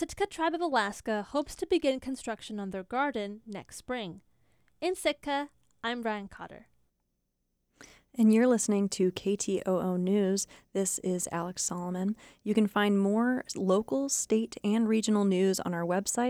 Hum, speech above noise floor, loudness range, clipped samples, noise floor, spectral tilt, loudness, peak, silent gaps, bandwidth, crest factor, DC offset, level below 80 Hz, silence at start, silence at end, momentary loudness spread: none; 50 dB; 8 LU; under 0.1%; -79 dBFS; -4.5 dB/octave; -30 LUFS; -14 dBFS; none; 16 kHz; 16 dB; under 0.1%; -62 dBFS; 0 s; 0 s; 11 LU